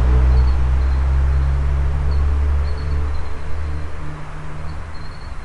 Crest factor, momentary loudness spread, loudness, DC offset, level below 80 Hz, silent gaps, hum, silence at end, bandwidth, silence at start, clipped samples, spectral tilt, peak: 12 dB; 16 LU; -20 LUFS; under 0.1%; -18 dBFS; none; none; 0 s; 5.8 kHz; 0 s; under 0.1%; -7.5 dB/octave; -4 dBFS